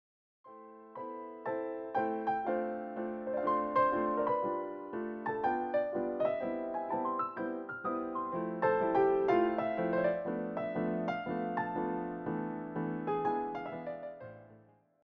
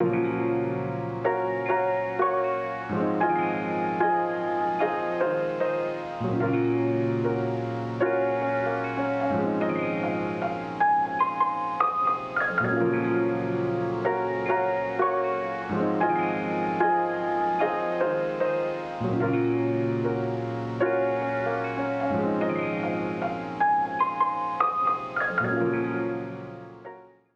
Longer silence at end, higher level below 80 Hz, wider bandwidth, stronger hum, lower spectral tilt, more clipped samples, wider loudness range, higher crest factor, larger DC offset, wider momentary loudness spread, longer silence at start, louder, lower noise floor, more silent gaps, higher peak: first, 0.45 s vs 0.3 s; second, -70 dBFS vs -62 dBFS; second, 5.8 kHz vs 7.2 kHz; neither; second, -6 dB/octave vs -8.5 dB/octave; neither; first, 5 LU vs 1 LU; about the same, 18 dB vs 18 dB; neither; first, 12 LU vs 5 LU; first, 0.45 s vs 0 s; second, -34 LUFS vs -26 LUFS; first, -62 dBFS vs -46 dBFS; neither; second, -18 dBFS vs -8 dBFS